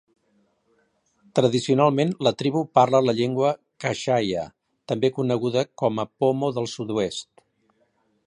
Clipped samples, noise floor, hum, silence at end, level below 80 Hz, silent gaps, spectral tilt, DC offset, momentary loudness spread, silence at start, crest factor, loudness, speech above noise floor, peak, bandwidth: under 0.1%; -67 dBFS; none; 1.05 s; -64 dBFS; none; -6 dB/octave; under 0.1%; 10 LU; 1.35 s; 20 dB; -23 LUFS; 45 dB; -4 dBFS; 11 kHz